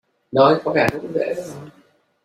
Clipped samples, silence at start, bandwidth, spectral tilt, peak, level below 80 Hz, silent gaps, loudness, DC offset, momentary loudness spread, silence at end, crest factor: under 0.1%; 0.3 s; 16 kHz; -6 dB/octave; -2 dBFS; -54 dBFS; none; -19 LUFS; under 0.1%; 17 LU; 0.55 s; 18 dB